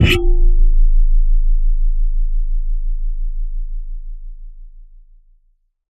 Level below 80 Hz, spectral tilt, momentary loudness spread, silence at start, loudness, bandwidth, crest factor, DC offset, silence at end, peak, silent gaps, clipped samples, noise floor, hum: -14 dBFS; -6 dB/octave; 18 LU; 0 s; -21 LUFS; 5.2 kHz; 12 dB; under 0.1%; 1.1 s; 0 dBFS; none; under 0.1%; -58 dBFS; none